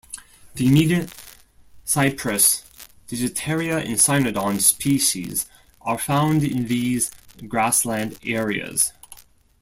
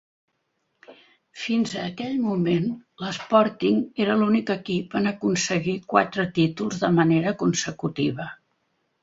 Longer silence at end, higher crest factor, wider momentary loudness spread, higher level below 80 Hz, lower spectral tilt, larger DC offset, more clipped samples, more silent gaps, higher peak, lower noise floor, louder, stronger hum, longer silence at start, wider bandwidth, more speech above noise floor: second, 0.45 s vs 0.7 s; about the same, 22 dB vs 22 dB; first, 15 LU vs 9 LU; first, -52 dBFS vs -62 dBFS; second, -4 dB/octave vs -5.5 dB/octave; neither; neither; neither; about the same, -2 dBFS vs -2 dBFS; second, -49 dBFS vs -74 dBFS; first, -20 LUFS vs -24 LUFS; neither; second, 0.1 s vs 0.9 s; first, 16.5 kHz vs 7.8 kHz; second, 28 dB vs 51 dB